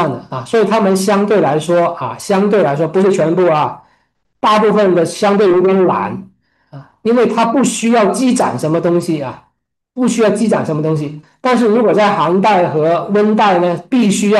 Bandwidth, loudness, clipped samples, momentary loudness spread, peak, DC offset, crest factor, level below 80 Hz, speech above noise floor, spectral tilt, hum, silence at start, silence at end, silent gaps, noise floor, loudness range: 12.5 kHz; -13 LUFS; under 0.1%; 8 LU; -2 dBFS; under 0.1%; 10 dB; -58 dBFS; 52 dB; -5.5 dB/octave; none; 0 s; 0 s; none; -64 dBFS; 2 LU